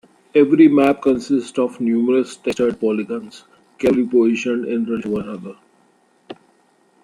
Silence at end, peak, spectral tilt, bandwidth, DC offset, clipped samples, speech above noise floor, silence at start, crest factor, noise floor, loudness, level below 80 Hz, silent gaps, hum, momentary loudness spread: 0.7 s; -2 dBFS; -6.5 dB/octave; 11 kHz; under 0.1%; under 0.1%; 41 dB; 0.35 s; 16 dB; -58 dBFS; -18 LUFS; -58 dBFS; none; none; 15 LU